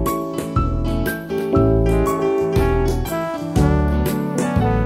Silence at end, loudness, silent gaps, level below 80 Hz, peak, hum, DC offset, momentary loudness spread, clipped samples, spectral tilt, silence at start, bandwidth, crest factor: 0 s; -19 LUFS; none; -24 dBFS; -4 dBFS; none; under 0.1%; 6 LU; under 0.1%; -7 dB/octave; 0 s; 16 kHz; 14 dB